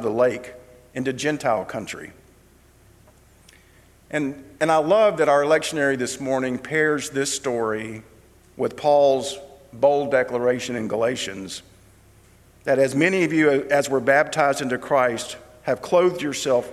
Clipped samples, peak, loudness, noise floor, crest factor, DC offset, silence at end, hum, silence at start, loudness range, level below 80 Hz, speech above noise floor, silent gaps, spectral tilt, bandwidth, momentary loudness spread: under 0.1%; -2 dBFS; -21 LUFS; -54 dBFS; 20 dB; under 0.1%; 0 s; none; 0 s; 9 LU; -58 dBFS; 32 dB; none; -4.5 dB/octave; 14.5 kHz; 15 LU